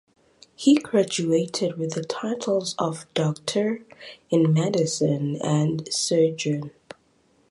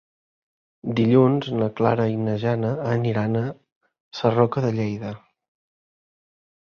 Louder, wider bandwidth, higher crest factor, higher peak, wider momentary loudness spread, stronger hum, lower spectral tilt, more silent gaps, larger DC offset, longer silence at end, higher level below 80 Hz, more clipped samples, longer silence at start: about the same, -24 LUFS vs -22 LUFS; first, 11.5 kHz vs 6.8 kHz; about the same, 16 dB vs 20 dB; second, -8 dBFS vs -2 dBFS; second, 9 LU vs 14 LU; neither; second, -5.5 dB/octave vs -8.5 dB/octave; second, none vs 3.72-3.81 s, 4.00-4.11 s; neither; second, 0.8 s vs 1.45 s; second, -66 dBFS vs -58 dBFS; neither; second, 0.6 s vs 0.85 s